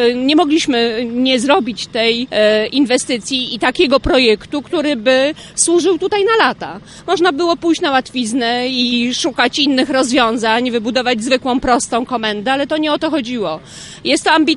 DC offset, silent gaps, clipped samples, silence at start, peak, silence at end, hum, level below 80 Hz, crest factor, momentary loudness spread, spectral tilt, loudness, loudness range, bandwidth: under 0.1%; none; under 0.1%; 0 s; 0 dBFS; 0 s; none; -42 dBFS; 14 dB; 6 LU; -2.5 dB/octave; -14 LUFS; 2 LU; 11.5 kHz